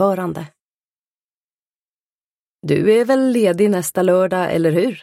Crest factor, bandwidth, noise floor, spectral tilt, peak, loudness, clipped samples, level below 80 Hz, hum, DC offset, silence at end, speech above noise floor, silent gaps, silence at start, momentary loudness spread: 14 dB; 16 kHz; under -90 dBFS; -6 dB/octave; -4 dBFS; -16 LUFS; under 0.1%; -60 dBFS; none; under 0.1%; 0 s; over 74 dB; 0.61-2.58 s; 0 s; 10 LU